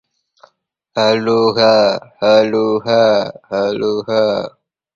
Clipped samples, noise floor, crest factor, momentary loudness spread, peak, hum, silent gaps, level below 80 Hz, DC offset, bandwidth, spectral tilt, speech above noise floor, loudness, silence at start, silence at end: under 0.1%; -61 dBFS; 16 dB; 9 LU; 0 dBFS; none; none; -58 dBFS; under 0.1%; 7.4 kHz; -5.5 dB/octave; 47 dB; -14 LUFS; 0.95 s; 0.45 s